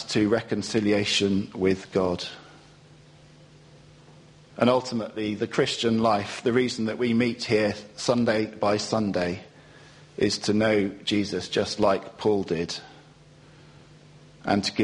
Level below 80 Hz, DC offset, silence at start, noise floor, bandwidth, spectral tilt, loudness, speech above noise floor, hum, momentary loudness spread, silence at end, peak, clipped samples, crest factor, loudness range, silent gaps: -58 dBFS; under 0.1%; 0 s; -52 dBFS; 10.5 kHz; -5 dB/octave; -25 LUFS; 27 dB; none; 8 LU; 0 s; -6 dBFS; under 0.1%; 20 dB; 5 LU; none